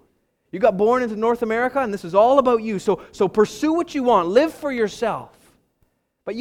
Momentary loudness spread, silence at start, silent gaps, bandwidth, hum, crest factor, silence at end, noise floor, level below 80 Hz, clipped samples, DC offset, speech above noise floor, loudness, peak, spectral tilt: 9 LU; 0.55 s; none; 15 kHz; none; 18 dB; 0 s; -67 dBFS; -56 dBFS; under 0.1%; under 0.1%; 48 dB; -20 LUFS; -2 dBFS; -5.5 dB/octave